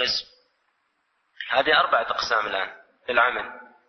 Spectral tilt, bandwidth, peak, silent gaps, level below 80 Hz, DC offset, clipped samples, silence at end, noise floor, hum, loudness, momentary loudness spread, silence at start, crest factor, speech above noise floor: -1.5 dB/octave; 6.4 kHz; -6 dBFS; none; -62 dBFS; under 0.1%; under 0.1%; 0.25 s; -71 dBFS; none; -23 LUFS; 17 LU; 0 s; 20 dB; 49 dB